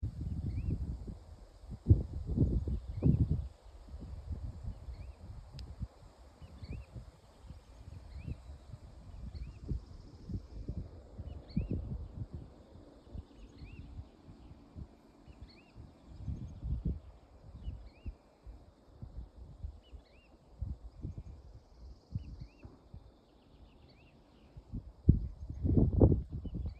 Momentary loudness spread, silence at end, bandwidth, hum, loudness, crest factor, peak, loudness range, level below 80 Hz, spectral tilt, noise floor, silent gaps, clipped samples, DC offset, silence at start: 26 LU; 0 s; 8.2 kHz; none; -38 LUFS; 28 dB; -10 dBFS; 17 LU; -44 dBFS; -10.5 dB/octave; -62 dBFS; none; under 0.1%; under 0.1%; 0 s